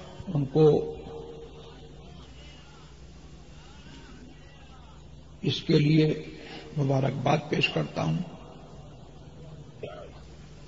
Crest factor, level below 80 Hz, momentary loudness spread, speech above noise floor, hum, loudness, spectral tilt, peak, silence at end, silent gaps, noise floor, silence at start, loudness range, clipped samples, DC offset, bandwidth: 20 dB; -52 dBFS; 27 LU; 24 dB; none; -26 LUFS; -7 dB/octave; -10 dBFS; 0 s; none; -49 dBFS; 0 s; 22 LU; under 0.1%; 0.2%; 7.8 kHz